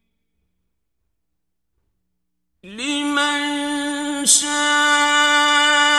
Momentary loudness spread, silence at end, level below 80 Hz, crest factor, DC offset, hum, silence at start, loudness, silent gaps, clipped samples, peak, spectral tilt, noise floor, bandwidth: 9 LU; 0 s; -62 dBFS; 20 dB; under 0.1%; none; 2.65 s; -16 LUFS; none; under 0.1%; 0 dBFS; 1 dB/octave; -79 dBFS; 15 kHz